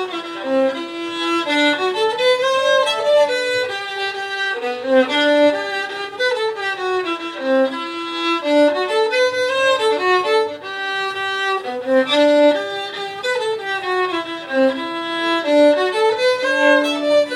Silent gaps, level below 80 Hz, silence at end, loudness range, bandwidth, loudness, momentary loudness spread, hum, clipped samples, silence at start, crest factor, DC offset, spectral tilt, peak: none; -68 dBFS; 0 s; 2 LU; 13.5 kHz; -18 LUFS; 9 LU; none; under 0.1%; 0 s; 16 dB; under 0.1%; -2.5 dB/octave; -2 dBFS